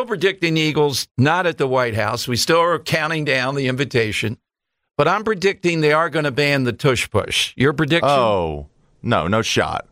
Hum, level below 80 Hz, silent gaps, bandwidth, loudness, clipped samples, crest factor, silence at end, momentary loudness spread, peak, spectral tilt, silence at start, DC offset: none; -46 dBFS; 1.11-1.15 s; 16 kHz; -18 LUFS; under 0.1%; 14 dB; 0.1 s; 5 LU; -4 dBFS; -4.5 dB/octave; 0 s; under 0.1%